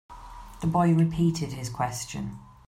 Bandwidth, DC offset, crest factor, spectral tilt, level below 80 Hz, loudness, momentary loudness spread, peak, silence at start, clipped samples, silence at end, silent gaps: 15 kHz; under 0.1%; 16 dB; -6.5 dB/octave; -48 dBFS; -27 LUFS; 21 LU; -10 dBFS; 0.1 s; under 0.1%; 0.25 s; none